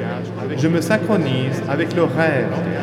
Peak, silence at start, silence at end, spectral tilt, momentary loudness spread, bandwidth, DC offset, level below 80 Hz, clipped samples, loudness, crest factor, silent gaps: -4 dBFS; 0 s; 0 s; -6.5 dB/octave; 7 LU; 14.5 kHz; under 0.1%; -60 dBFS; under 0.1%; -19 LUFS; 16 dB; none